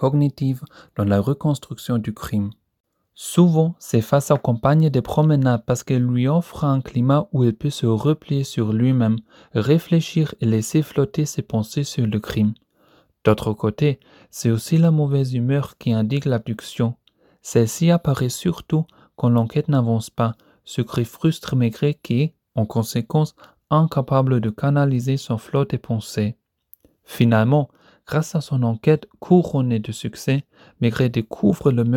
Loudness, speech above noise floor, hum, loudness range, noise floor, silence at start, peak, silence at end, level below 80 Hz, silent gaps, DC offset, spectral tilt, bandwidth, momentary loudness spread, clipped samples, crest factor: -21 LUFS; 38 dB; none; 4 LU; -58 dBFS; 0 s; -2 dBFS; 0 s; -52 dBFS; 2.80-2.84 s; under 0.1%; -7 dB/octave; 16.5 kHz; 8 LU; under 0.1%; 18 dB